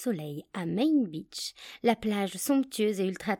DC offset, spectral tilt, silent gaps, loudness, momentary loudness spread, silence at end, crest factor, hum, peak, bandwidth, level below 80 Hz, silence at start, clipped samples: under 0.1%; -5 dB/octave; none; -30 LUFS; 10 LU; 0.05 s; 18 dB; none; -12 dBFS; 17.5 kHz; -66 dBFS; 0 s; under 0.1%